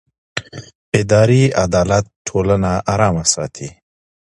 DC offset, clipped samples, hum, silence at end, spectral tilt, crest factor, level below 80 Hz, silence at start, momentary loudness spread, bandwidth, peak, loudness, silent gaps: under 0.1%; under 0.1%; none; 0.65 s; -5 dB/octave; 16 dB; -36 dBFS; 0.35 s; 17 LU; 11.5 kHz; 0 dBFS; -15 LUFS; 0.75-0.92 s, 2.16-2.25 s